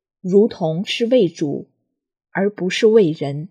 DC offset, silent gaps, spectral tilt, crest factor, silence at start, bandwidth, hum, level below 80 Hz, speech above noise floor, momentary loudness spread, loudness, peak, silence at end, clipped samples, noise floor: under 0.1%; none; -6 dB/octave; 16 dB; 0.25 s; 10 kHz; none; -70 dBFS; 59 dB; 11 LU; -18 LUFS; -2 dBFS; 0.05 s; under 0.1%; -75 dBFS